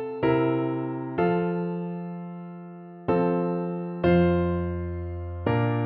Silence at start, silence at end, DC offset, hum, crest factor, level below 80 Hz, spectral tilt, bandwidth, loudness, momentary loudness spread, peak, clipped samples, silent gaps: 0 s; 0 s; under 0.1%; none; 16 dB; -46 dBFS; -11.5 dB/octave; 4.5 kHz; -26 LUFS; 14 LU; -10 dBFS; under 0.1%; none